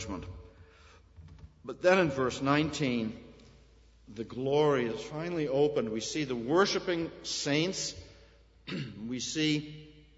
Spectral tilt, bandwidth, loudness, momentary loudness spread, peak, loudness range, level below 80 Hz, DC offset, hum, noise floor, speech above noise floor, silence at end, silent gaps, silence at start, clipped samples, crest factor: -4.5 dB/octave; 8 kHz; -31 LUFS; 20 LU; -10 dBFS; 2 LU; -58 dBFS; under 0.1%; none; -59 dBFS; 29 dB; 0.25 s; none; 0 s; under 0.1%; 22 dB